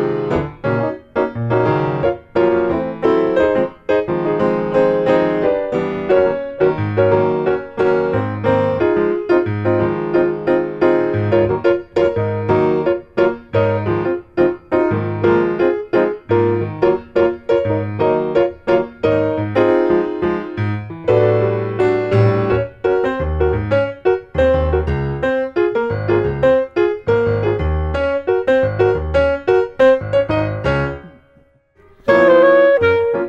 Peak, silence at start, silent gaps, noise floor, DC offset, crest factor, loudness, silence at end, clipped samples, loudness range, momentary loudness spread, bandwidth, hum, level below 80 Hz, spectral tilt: -2 dBFS; 0 s; none; -53 dBFS; under 0.1%; 14 dB; -16 LUFS; 0 s; under 0.1%; 1 LU; 5 LU; 7.4 kHz; none; -34 dBFS; -9 dB/octave